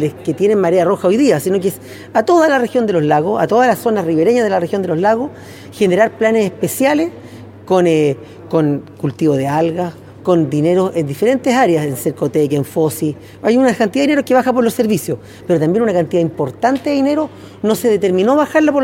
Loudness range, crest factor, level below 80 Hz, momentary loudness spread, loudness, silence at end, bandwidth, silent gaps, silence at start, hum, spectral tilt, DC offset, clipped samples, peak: 2 LU; 14 dB; -56 dBFS; 8 LU; -15 LUFS; 0 s; 17 kHz; none; 0 s; none; -6 dB/octave; under 0.1%; under 0.1%; -2 dBFS